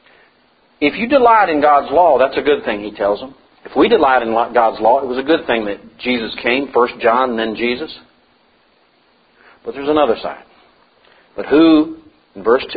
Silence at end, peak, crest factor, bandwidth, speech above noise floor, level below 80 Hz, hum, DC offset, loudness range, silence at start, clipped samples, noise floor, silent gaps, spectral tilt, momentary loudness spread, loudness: 0 s; 0 dBFS; 16 dB; 5 kHz; 41 dB; -50 dBFS; none; under 0.1%; 8 LU; 0.8 s; under 0.1%; -55 dBFS; none; -9 dB/octave; 13 LU; -15 LUFS